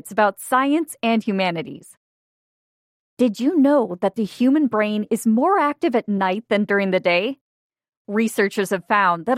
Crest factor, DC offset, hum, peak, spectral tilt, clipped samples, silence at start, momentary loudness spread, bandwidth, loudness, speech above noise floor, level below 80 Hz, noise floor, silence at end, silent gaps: 16 dB; under 0.1%; none; -4 dBFS; -5.5 dB/octave; under 0.1%; 0.05 s; 6 LU; 16 kHz; -20 LUFS; over 71 dB; -74 dBFS; under -90 dBFS; 0 s; 1.97-3.17 s, 7.41-7.70 s, 7.97-8.05 s